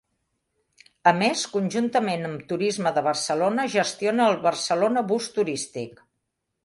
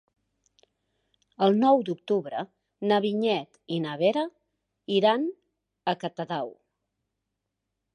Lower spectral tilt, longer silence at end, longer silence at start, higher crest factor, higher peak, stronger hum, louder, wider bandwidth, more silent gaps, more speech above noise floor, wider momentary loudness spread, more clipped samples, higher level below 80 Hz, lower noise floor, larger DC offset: second, -4 dB/octave vs -7 dB/octave; second, 0.75 s vs 1.4 s; second, 1.05 s vs 1.4 s; about the same, 20 dB vs 20 dB; first, -4 dBFS vs -8 dBFS; neither; first, -24 LUFS vs -27 LUFS; first, 11.5 kHz vs 9.8 kHz; neither; about the same, 55 dB vs 58 dB; second, 9 LU vs 13 LU; neither; first, -70 dBFS vs -80 dBFS; second, -79 dBFS vs -83 dBFS; neither